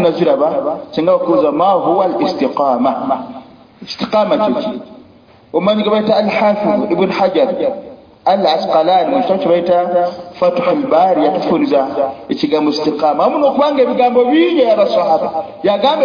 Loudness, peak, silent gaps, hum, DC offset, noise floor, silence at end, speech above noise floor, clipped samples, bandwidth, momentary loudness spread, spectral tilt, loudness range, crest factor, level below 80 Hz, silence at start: -14 LUFS; 0 dBFS; none; none; under 0.1%; -44 dBFS; 0 s; 31 dB; under 0.1%; 5.2 kHz; 8 LU; -7 dB/octave; 4 LU; 12 dB; -58 dBFS; 0 s